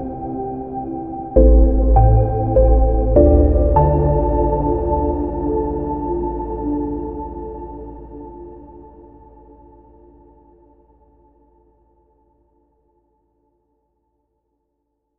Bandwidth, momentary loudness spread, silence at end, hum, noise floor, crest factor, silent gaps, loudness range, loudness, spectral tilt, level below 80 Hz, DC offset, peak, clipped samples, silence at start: 1.9 kHz; 21 LU; 6.2 s; none; -72 dBFS; 16 dB; none; 20 LU; -17 LUFS; -14.5 dB/octave; -22 dBFS; under 0.1%; -2 dBFS; under 0.1%; 0 s